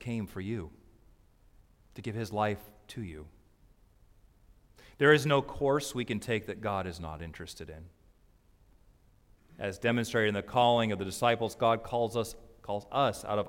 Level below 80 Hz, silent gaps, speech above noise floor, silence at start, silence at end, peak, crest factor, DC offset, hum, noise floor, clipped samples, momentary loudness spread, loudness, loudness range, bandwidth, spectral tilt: -58 dBFS; none; 33 dB; 0 s; 0 s; -8 dBFS; 24 dB; under 0.1%; none; -63 dBFS; under 0.1%; 18 LU; -31 LUFS; 10 LU; 16.5 kHz; -5 dB/octave